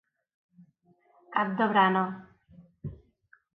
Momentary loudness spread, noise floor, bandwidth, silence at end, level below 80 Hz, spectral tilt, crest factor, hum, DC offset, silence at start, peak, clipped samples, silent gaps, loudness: 21 LU; -66 dBFS; 4.6 kHz; 0.6 s; -64 dBFS; -9 dB/octave; 22 dB; none; under 0.1%; 1.3 s; -10 dBFS; under 0.1%; none; -26 LUFS